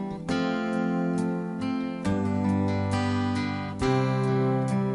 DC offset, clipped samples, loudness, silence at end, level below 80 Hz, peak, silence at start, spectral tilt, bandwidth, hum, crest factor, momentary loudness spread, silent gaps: under 0.1%; under 0.1%; -27 LUFS; 0 s; -52 dBFS; -12 dBFS; 0 s; -7.5 dB/octave; 11.5 kHz; none; 14 dB; 5 LU; none